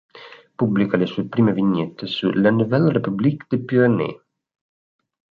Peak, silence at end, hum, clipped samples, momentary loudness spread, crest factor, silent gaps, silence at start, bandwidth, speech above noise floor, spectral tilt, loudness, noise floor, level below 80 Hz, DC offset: -4 dBFS; 1.25 s; none; under 0.1%; 7 LU; 16 dB; none; 0.15 s; 5.2 kHz; 22 dB; -9.5 dB/octave; -20 LUFS; -41 dBFS; -60 dBFS; under 0.1%